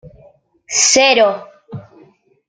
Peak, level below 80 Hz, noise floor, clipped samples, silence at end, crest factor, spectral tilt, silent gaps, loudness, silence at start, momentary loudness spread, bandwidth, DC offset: 0 dBFS; -58 dBFS; -49 dBFS; under 0.1%; 0.65 s; 18 dB; -1 dB/octave; none; -12 LUFS; 0.05 s; 25 LU; 10.5 kHz; under 0.1%